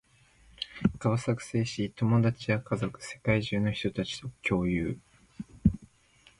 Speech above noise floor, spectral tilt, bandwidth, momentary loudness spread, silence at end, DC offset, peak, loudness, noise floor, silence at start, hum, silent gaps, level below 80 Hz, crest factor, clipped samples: 32 dB; -6.5 dB/octave; 11.5 kHz; 12 LU; 0.55 s; under 0.1%; -10 dBFS; -30 LUFS; -62 dBFS; 0.6 s; none; none; -48 dBFS; 20 dB; under 0.1%